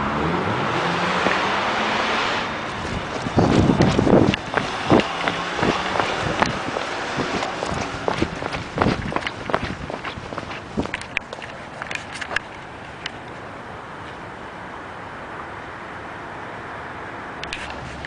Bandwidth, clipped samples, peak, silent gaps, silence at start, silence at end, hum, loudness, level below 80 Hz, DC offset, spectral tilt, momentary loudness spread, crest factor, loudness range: 10.5 kHz; under 0.1%; 0 dBFS; none; 0 s; 0 s; none; -23 LUFS; -40 dBFS; under 0.1%; -5.5 dB/octave; 16 LU; 24 dB; 14 LU